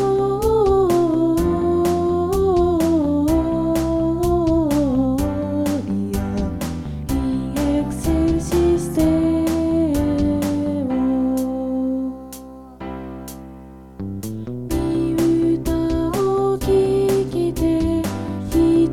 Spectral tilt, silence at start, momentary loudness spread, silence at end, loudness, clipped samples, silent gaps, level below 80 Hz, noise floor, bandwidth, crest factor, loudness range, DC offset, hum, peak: -7 dB/octave; 0 s; 12 LU; 0 s; -19 LUFS; under 0.1%; none; -32 dBFS; -39 dBFS; 16.5 kHz; 14 dB; 6 LU; 0.5%; none; -6 dBFS